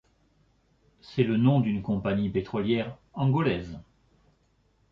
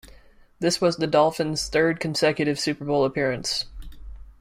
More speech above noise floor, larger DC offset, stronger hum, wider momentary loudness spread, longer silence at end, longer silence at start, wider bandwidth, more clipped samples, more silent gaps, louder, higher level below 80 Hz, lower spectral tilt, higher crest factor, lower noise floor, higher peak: first, 41 dB vs 28 dB; neither; neither; first, 13 LU vs 6 LU; first, 1.1 s vs 0.1 s; first, 1.1 s vs 0.05 s; second, 6.4 kHz vs 16 kHz; neither; neither; second, -27 LUFS vs -23 LUFS; second, -54 dBFS vs -46 dBFS; first, -9.5 dB/octave vs -4.5 dB/octave; about the same, 18 dB vs 18 dB; first, -67 dBFS vs -51 dBFS; second, -10 dBFS vs -6 dBFS